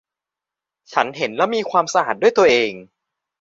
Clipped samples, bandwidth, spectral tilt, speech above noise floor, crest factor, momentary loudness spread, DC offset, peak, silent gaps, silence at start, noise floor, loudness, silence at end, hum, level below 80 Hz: under 0.1%; 7.8 kHz; -3.5 dB/octave; 69 dB; 18 dB; 9 LU; under 0.1%; 0 dBFS; none; 0.9 s; -87 dBFS; -18 LUFS; 0.6 s; 50 Hz at -55 dBFS; -62 dBFS